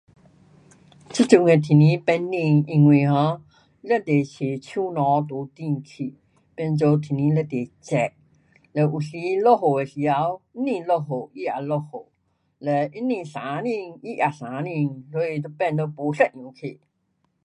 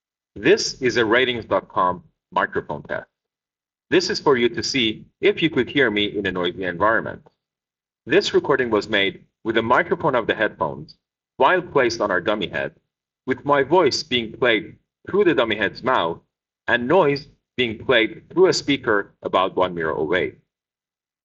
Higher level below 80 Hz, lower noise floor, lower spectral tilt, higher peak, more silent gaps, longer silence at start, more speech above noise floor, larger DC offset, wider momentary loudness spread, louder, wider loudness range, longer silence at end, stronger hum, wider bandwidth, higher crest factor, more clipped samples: second, -66 dBFS vs -58 dBFS; second, -71 dBFS vs under -90 dBFS; first, -7.5 dB/octave vs -2.5 dB/octave; first, 0 dBFS vs -4 dBFS; neither; first, 1.1 s vs 0.35 s; second, 49 dB vs over 70 dB; neither; first, 15 LU vs 10 LU; about the same, -22 LUFS vs -20 LUFS; first, 8 LU vs 2 LU; second, 0.7 s vs 0.95 s; neither; first, 10 kHz vs 7.6 kHz; about the same, 22 dB vs 18 dB; neither